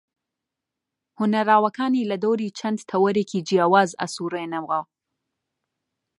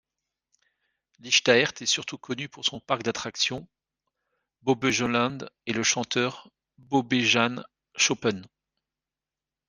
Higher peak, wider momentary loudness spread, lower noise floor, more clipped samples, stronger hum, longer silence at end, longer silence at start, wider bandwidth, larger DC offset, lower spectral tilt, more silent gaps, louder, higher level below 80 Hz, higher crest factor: about the same, -4 dBFS vs -4 dBFS; second, 10 LU vs 13 LU; second, -85 dBFS vs under -90 dBFS; neither; neither; first, 1.35 s vs 1.2 s; about the same, 1.2 s vs 1.25 s; first, 11.5 kHz vs 10 kHz; neither; first, -5.5 dB/octave vs -2.5 dB/octave; neither; first, -22 LUFS vs -25 LUFS; second, -74 dBFS vs -68 dBFS; about the same, 20 dB vs 24 dB